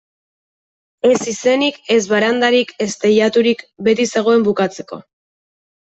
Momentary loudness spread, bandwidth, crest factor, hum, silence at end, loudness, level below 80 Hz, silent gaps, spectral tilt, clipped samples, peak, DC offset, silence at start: 8 LU; 8.2 kHz; 14 dB; none; 0.85 s; -15 LUFS; -62 dBFS; none; -4 dB/octave; under 0.1%; -2 dBFS; under 0.1%; 1.05 s